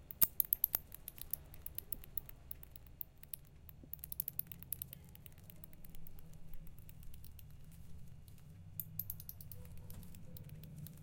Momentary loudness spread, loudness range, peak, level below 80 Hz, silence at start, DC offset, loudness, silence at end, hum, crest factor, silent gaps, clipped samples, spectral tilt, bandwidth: 23 LU; 16 LU; -10 dBFS; -58 dBFS; 0 s; under 0.1%; -41 LUFS; 0 s; none; 36 dB; none; under 0.1%; -3.5 dB/octave; 17 kHz